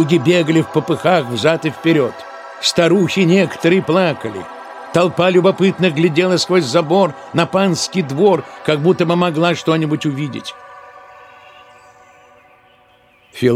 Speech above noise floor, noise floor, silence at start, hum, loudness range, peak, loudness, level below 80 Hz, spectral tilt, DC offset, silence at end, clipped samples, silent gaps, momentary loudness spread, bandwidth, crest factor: 36 dB; -51 dBFS; 0 s; none; 7 LU; 0 dBFS; -15 LUFS; -58 dBFS; -5.5 dB/octave; under 0.1%; 0 s; under 0.1%; none; 10 LU; 14.5 kHz; 16 dB